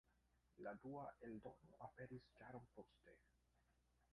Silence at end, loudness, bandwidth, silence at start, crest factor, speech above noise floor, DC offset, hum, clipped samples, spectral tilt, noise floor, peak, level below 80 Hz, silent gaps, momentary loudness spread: 0.1 s; -59 LUFS; 10 kHz; 0.05 s; 18 dB; 24 dB; under 0.1%; 60 Hz at -75 dBFS; under 0.1%; -8 dB/octave; -82 dBFS; -42 dBFS; -80 dBFS; none; 9 LU